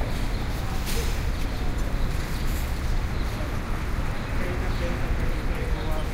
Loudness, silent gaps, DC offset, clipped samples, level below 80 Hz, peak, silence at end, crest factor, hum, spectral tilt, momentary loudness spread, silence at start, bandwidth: -30 LUFS; none; under 0.1%; under 0.1%; -26 dBFS; -12 dBFS; 0 s; 12 dB; none; -5.5 dB/octave; 2 LU; 0 s; 16 kHz